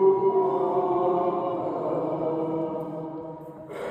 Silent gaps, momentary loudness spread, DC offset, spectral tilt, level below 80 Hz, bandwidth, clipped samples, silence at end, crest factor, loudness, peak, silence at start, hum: none; 14 LU; under 0.1%; -9.5 dB/octave; -66 dBFS; 4.3 kHz; under 0.1%; 0 s; 16 dB; -26 LUFS; -10 dBFS; 0 s; none